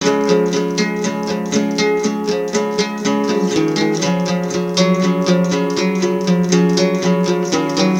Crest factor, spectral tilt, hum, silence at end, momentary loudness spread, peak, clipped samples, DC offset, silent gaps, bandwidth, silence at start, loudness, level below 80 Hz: 16 dB; -5 dB/octave; none; 0 s; 4 LU; 0 dBFS; under 0.1%; under 0.1%; none; 16 kHz; 0 s; -16 LUFS; -56 dBFS